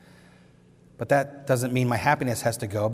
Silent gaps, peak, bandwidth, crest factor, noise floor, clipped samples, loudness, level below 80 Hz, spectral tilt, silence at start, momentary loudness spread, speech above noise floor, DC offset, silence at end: none; -6 dBFS; 16 kHz; 20 dB; -55 dBFS; under 0.1%; -25 LUFS; -60 dBFS; -5.5 dB/octave; 1 s; 4 LU; 30 dB; under 0.1%; 0 s